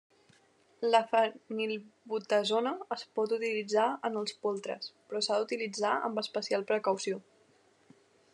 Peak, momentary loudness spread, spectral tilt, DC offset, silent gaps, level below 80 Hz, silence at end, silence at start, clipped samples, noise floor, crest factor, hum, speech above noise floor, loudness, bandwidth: -12 dBFS; 10 LU; -3.5 dB/octave; under 0.1%; none; under -90 dBFS; 1.15 s; 0.8 s; under 0.1%; -66 dBFS; 22 dB; none; 34 dB; -32 LUFS; 11 kHz